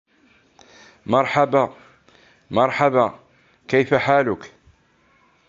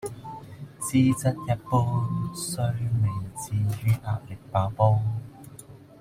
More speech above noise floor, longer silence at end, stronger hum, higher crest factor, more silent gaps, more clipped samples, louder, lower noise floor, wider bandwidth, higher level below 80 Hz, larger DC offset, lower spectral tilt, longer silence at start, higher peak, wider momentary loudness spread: first, 41 dB vs 22 dB; first, 1 s vs 0.2 s; neither; about the same, 20 dB vs 20 dB; neither; neither; first, -19 LUFS vs -26 LUFS; first, -59 dBFS vs -47 dBFS; second, 7.6 kHz vs 16 kHz; second, -58 dBFS vs -52 dBFS; neither; about the same, -6.5 dB/octave vs -6.5 dB/octave; first, 1.1 s vs 0 s; first, -2 dBFS vs -6 dBFS; second, 8 LU vs 18 LU